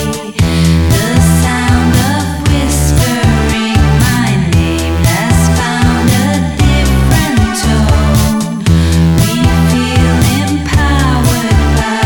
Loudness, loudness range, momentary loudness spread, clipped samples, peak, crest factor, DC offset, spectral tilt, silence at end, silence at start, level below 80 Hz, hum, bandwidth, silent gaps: -10 LUFS; 0 LU; 3 LU; under 0.1%; 0 dBFS; 10 dB; under 0.1%; -5.5 dB/octave; 0 s; 0 s; -16 dBFS; none; 19.5 kHz; none